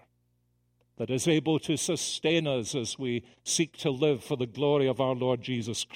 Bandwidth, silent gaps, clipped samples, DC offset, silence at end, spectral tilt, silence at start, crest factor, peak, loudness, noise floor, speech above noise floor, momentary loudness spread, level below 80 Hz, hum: 16 kHz; none; under 0.1%; under 0.1%; 0 s; -4.5 dB/octave; 1 s; 18 dB; -12 dBFS; -29 LUFS; -72 dBFS; 43 dB; 7 LU; -66 dBFS; 60 Hz at -55 dBFS